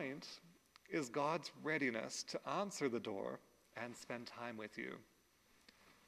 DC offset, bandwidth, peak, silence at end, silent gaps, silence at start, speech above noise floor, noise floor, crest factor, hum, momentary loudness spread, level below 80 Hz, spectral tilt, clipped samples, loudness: under 0.1%; 14.5 kHz; -26 dBFS; 0.15 s; none; 0 s; 29 dB; -73 dBFS; 20 dB; none; 13 LU; -84 dBFS; -4 dB/octave; under 0.1%; -44 LUFS